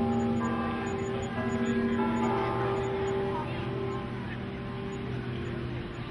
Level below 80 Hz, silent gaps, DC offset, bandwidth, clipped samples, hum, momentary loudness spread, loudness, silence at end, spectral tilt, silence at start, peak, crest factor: -50 dBFS; none; under 0.1%; 11 kHz; under 0.1%; none; 8 LU; -31 LUFS; 0 s; -7 dB/octave; 0 s; -18 dBFS; 14 dB